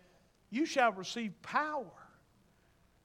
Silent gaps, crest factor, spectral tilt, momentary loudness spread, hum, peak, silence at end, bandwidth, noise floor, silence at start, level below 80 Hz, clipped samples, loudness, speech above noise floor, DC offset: none; 22 dB; -3.5 dB/octave; 12 LU; none; -16 dBFS; 1 s; 16 kHz; -69 dBFS; 0.5 s; -76 dBFS; under 0.1%; -35 LUFS; 34 dB; under 0.1%